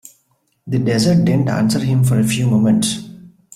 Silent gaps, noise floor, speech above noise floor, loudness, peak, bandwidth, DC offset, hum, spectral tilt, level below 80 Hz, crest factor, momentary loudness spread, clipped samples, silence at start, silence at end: none; -63 dBFS; 49 dB; -16 LUFS; -4 dBFS; 14.5 kHz; under 0.1%; none; -6 dB/octave; -50 dBFS; 12 dB; 7 LU; under 0.1%; 0.65 s; 0.25 s